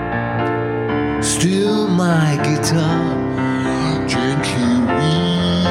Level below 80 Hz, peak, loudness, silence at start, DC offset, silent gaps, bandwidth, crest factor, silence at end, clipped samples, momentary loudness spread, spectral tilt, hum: -40 dBFS; -4 dBFS; -17 LUFS; 0 s; under 0.1%; none; 15 kHz; 14 dB; 0 s; under 0.1%; 4 LU; -5.5 dB/octave; none